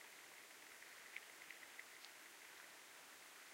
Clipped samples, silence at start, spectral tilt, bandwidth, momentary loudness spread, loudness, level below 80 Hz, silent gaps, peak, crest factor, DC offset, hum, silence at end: under 0.1%; 0 s; 0.5 dB/octave; 16 kHz; 4 LU; -57 LUFS; under -90 dBFS; none; -34 dBFS; 26 dB; under 0.1%; none; 0 s